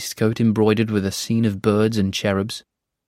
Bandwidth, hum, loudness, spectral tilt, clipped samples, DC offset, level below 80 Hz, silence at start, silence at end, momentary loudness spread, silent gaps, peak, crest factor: 16 kHz; none; -20 LUFS; -6 dB/octave; under 0.1%; under 0.1%; -56 dBFS; 0 s; 0.5 s; 5 LU; none; -4 dBFS; 16 dB